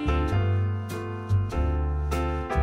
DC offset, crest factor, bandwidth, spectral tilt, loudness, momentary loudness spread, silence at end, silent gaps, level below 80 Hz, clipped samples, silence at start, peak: under 0.1%; 14 dB; 15 kHz; -7.5 dB/octave; -27 LUFS; 6 LU; 0 s; none; -30 dBFS; under 0.1%; 0 s; -10 dBFS